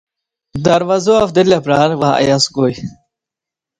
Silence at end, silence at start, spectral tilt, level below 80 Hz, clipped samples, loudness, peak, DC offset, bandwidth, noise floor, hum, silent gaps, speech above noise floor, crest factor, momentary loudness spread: 0.9 s; 0.55 s; -5 dB/octave; -48 dBFS; under 0.1%; -13 LUFS; 0 dBFS; under 0.1%; 10.5 kHz; -85 dBFS; none; none; 73 dB; 14 dB; 10 LU